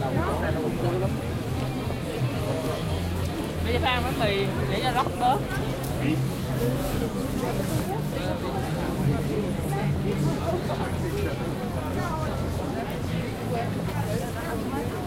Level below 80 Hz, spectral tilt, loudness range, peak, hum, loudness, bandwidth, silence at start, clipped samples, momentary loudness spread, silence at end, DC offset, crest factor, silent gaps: -40 dBFS; -6 dB/octave; 3 LU; -10 dBFS; none; -27 LUFS; 16 kHz; 0 s; under 0.1%; 5 LU; 0 s; under 0.1%; 16 dB; none